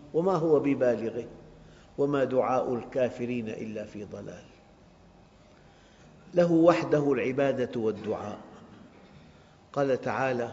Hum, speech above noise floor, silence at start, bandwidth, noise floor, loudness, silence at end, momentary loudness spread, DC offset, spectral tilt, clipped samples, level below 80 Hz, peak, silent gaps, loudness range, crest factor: none; 29 dB; 0 s; 7.6 kHz; -56 dBFS; -28 LUFS; 0 s; 17 LU; under 0.1%; -6.5 dB/octave; under 0.1%; -64 dBFS; -6 dBFS; none; 8 LU; 22 dB